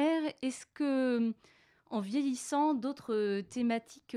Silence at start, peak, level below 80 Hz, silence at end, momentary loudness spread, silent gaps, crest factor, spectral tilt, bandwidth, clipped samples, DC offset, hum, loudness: 0 s; -22 dBFS; -80 dBFS; 0 s; 8 LU; none; 12 dB; -5 dB/octave; 13.5 kHz; under 0.1%; under 0.1%; none; -33 LUFS